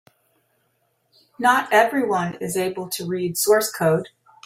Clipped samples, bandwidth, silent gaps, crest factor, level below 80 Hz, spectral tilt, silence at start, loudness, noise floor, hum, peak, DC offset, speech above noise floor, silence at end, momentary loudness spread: under 0.1%; 16 kHz; none; 20 dB; -66 dBFS; -4 dB/octave; 1.4 s; -21 LUFS; -68 dBFS; none; -2 dBFS; under 0.1%; 48 dB; 0.4 s; 9 LU